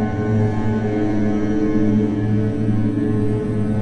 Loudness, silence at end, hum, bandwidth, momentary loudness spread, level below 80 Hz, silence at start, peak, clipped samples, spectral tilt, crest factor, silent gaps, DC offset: -19 LUFS; 0 s; none; 8.6 kHz; 3 LU; -36 dBFS; 0 s; -6 dBFS; under 0.1%; -9.5 dB/octave; 12 dB; none; under 0.1%